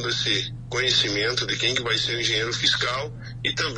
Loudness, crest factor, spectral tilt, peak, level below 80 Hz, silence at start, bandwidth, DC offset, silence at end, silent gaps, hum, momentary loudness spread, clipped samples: -22 LUFS; 18 dB; -2.5 dB/octave; -8 dBFS; -48 dBFS; 0 s; 10 kHz; under 0.1%; 0 s; none; none; 8 LU; under 0.1%